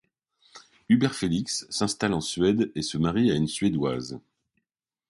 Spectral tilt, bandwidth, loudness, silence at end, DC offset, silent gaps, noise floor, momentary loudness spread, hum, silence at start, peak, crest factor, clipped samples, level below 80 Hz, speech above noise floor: -5 dB/octave; 11.5 kHz; -26 LUFS; 0.9 s; under 0.1%; none; -87 dBFS; 6 LU; none; 0.55 s; -10 dBFS; 18 dB; under 0.1%; -54 dBFS; 62 dB